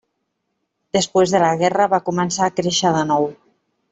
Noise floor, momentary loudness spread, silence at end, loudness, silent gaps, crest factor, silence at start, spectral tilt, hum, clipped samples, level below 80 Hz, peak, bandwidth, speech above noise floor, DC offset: -74 dBFS; 5 LU; 0.55 s; -18 LUFS; none; 16 dB; 0.95 s; -4 dB/octave; none; under 0.1%; -58 dBFS; -4 dBFS; 8.4 kHz; 56 dB; under 0.1%